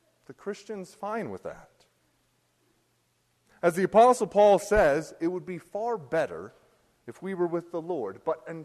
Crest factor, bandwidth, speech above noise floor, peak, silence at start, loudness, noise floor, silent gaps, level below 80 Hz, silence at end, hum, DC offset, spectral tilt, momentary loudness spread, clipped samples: 20 dB; 13 kHz; 45 dB; -8 dBFS; 0.3 s; -26 LUFS; -71 dBFS; none; -52 dBFS; 0 s; none; under 0.1%; -5.5 dB/octave; 20 LU; under 0.1%